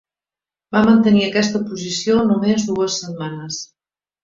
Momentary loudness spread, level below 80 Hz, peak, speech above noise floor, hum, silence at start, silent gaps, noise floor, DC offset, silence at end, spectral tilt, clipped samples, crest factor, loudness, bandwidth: 15 LU; -54 dBFS; -2 dBFS; over 73 dB; none; 0.7 s; none; under -90 dBFS; under 0.1%; 0.6 s; -5 dB/octave; under 0.1%; 16 dB; -17 LUFS; 7.6 kHz